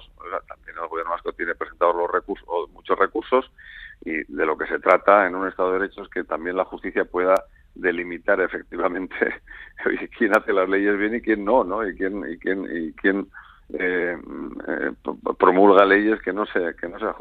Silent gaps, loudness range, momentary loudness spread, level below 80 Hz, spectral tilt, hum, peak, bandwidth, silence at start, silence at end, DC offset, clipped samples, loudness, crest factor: none; 5 LU; 15 LU; -52 dBFS; -6.5 dB/octave; none; 0 dBFS; 8.4 kHz; 0 s; 0 s; under 0.1%; under 0.1%; -22 LUFS; 22 dB